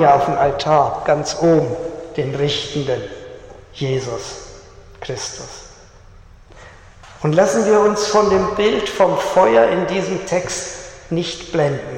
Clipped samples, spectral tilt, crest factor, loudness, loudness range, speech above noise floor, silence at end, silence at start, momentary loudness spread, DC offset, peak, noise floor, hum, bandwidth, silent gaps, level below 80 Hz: under 0.1%; -5 dB/octave; 18 dB; -17 LUFS; 13 LU; 26 dB; 0 s; 0 s; 18 LU; under 0.1%; -2 dBFS; -43 dBFS; none; 15.5 kHz; none; -44 dBFS